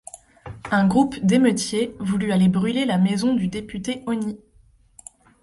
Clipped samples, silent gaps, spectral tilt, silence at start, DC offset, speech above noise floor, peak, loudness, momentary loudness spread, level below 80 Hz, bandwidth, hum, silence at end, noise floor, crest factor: under 0.1%; none; -6 dB/octave; 0.15 s; under 0.1%; 35 dB; -6 dBFS; -21 LUFS; 18 LU; -52 dBFS; 11.5 kHz; none; 1.05 s; -55 dBFS; 16 dB